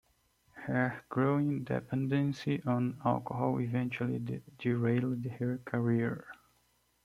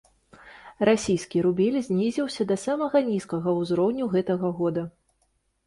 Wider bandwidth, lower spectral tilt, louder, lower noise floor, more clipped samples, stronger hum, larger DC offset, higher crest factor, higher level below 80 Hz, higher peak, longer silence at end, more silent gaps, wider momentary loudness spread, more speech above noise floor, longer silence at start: about the same, 12 kHz vs 11.5 kHz; first, -8.5 dB/octave vs -6.5 dB/octave; second, -33 LUFS vs -25 LUFS; about the same, -72 dBFS vs -71 dBFS; neither; neither; neither; about the same, 18 dB vs 18 dB; second, -68 dBFS vs -60 dBFS; second, -14 dBFS vs -8 dBFS; about the same, 0.7 s vs 0.8 s; neither; about the same, 6 LU vs 5 LU; second, 40 dB vs 46 dB; about the same, 0.55 s vs 0.45 s